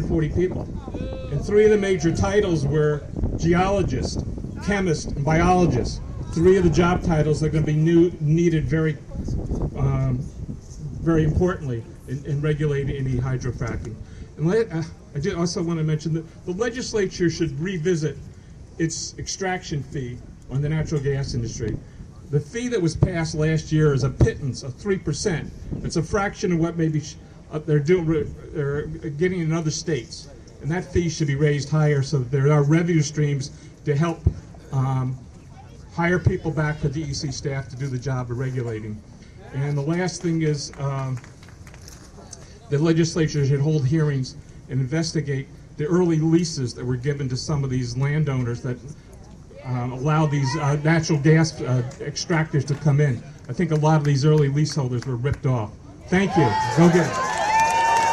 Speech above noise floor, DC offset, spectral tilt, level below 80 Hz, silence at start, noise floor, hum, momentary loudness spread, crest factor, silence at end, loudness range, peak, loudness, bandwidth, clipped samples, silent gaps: 21 dB; under 0.1%; -6.5 dB/octave; -38 dBFS; 0 s; -43 dBFS; none; 14 LU; 16 dB; 0 s; 6 LU; -6 dBFS; -23 LUFS; 10.5 kHz; under 0.1%; none